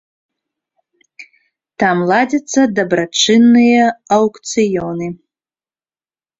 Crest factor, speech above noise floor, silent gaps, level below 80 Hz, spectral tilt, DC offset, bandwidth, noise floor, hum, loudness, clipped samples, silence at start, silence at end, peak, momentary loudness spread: 14 dB; over 77 dB; none; -56 dBFS; -4 dB/octave; under 0.1%; 7.8 kHz; under -90 dBFS; none; -13 LUFS; under 0.1%; 1.2 s; 1.25 s; -2 dBFS; 10 LU